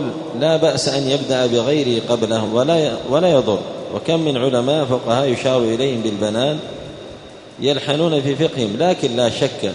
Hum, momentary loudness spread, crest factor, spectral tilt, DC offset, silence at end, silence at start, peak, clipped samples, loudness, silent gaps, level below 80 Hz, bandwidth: none; 9 LU; 16 dB; -5.5 dB/octave; under 0.1%; 0 s; 0 s; -2 dBFS; under 0.1%; -18 LUFS; none; -54 dBFS; 11 kHz